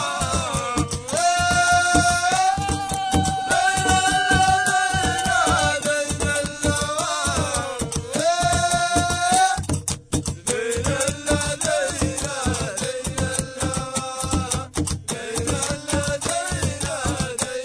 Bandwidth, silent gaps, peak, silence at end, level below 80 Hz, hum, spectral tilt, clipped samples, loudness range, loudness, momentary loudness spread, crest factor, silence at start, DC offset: 11 kHz; none; 0 dBFS; 0 s; -36 dBFS; none; -3 dB/octave; under 0.1%; 5 LU; -21 LUFS; 8 LU; 22 dB; 0 s; under 0.1%